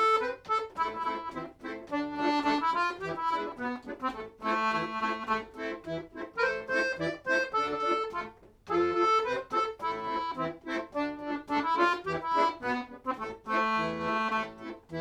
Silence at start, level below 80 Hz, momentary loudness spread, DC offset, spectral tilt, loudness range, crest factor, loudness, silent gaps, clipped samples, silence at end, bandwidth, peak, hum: 0 s; -64 dBFS; 10 LU; under 0.1%; -4.5 dB/octave; 2 LU; 18 dB; -31 LUFS; none; under 0.1%; 0 s; 13.5 kHz; -14 dBFS; none